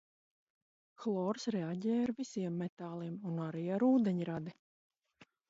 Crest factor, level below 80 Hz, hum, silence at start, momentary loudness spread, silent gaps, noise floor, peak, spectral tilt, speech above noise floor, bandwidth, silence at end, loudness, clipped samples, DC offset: 16 dB; -80 dBFS; none; 1 s; 12 LU; 2.69-2.77 s, 4.59-4.90 s; -67 dBFS; -20 dBFS; -7.5 dB/octave; 32 dB; 7.6 kHz; 0.25 s; -36 LUFS; under 0.1%; under 0.1%